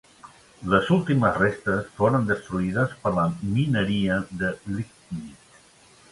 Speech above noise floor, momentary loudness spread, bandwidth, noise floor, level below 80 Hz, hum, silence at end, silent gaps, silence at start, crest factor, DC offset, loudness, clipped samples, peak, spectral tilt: 30 dB; 14 LU; 11.5 kHz; -54 dBFS; -50 dBFS; none; 0.8 s; none; 0.25 s; 20 dB; under 0.1%; -24 LUFS; under 0.1%; -6 dBFS; -7 dB/octave